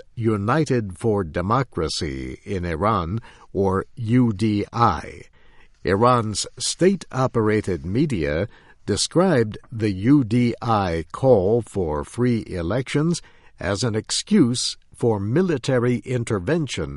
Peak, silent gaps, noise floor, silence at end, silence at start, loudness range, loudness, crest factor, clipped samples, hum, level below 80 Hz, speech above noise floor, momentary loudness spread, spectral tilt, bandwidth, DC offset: -4 dBFS; none; -49 dBFS; 0 s; 0.15 s; 3 LU; -22 LUFS; 18 dB; under 0.1%; none; -44 dBFS; 28 dB; 9 LU; -5.5 dB/octave; 11.5 kHz; under 0.1%